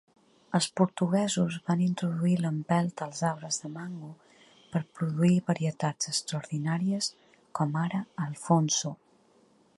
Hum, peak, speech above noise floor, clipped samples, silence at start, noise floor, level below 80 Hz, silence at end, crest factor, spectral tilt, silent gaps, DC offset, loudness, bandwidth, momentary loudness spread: none; -8 dBFS; 35 dB; under 0.1%; 0.5 s; -63 dBFS; -72 dBFS; 0.85 s; 20 dB; -5 dB/octave; none; under 0.1%; -29 LUFS; 11.5 kHz; 11 LU